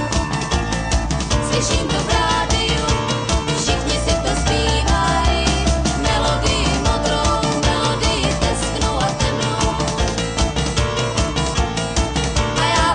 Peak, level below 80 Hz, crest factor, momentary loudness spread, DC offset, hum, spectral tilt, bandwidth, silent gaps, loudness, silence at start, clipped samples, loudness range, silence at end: -6 dBFS; -24 dBFS; 12 dB; 3 LU; under 0.1%; none; -4 dB/octave; 10 kHz; none; -18 LUFS; 0 s; under 0.1%; 2 LU; 0 s